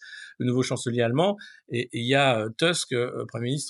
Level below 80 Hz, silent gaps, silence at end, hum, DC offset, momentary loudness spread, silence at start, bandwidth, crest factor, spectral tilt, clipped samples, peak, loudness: -76 dBFS; none; 0 s; none; under 0.1%; 10 LU; 0 s; 12 kHz; 18 dB; -4.5 dB/octave; under 0.1%; -8 dBFS; -25 LUFS